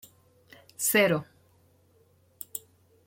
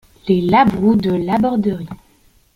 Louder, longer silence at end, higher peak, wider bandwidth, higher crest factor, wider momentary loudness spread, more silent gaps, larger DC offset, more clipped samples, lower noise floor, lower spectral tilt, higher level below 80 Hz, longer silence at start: second, -26 LUFS vs -16 LUFS; about the same, 0.5 s vs 0.6 s; second, -10 dBFS vs -2 dBFS; first, 16.5 kHz vs 11 kHz; first, 22 dB vs 16 dB; first, 21 LU vs 10 LU; neither; neither; neither; first, -64 dBFS vs -53 dBFS; second, -3 dB/octave vs -8.5 dB/octave; second, -72 dBFS vs -44 dBFS; first, 0.8 s vs 0.25 s